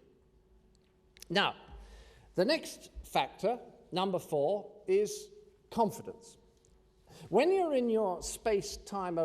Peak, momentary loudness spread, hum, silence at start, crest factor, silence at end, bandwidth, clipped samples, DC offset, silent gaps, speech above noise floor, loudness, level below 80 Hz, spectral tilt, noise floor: -14 dBFS; 17 LU; none; 1.3 s; 22 dB; 0 s; 15 kHz; under 0.1%; under 0.1%; none; 34 dB; -33 LUFS; -60 dBFS; -4.5 dB/octave; -66 dBFS